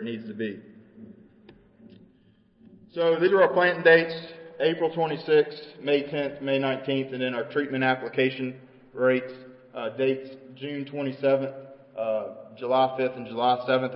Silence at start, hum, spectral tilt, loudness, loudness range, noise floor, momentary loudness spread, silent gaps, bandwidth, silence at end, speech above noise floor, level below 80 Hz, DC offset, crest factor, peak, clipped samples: 0 s; none; -10 dB/octave; -25 LUFS; 7 LU; -61 dBFS; 18 LU; none; 5.6 kHz; 0 s; 35 dB; -72 dBFS; under 0.1%; 20 dB; -8 dBFS; under 0.1%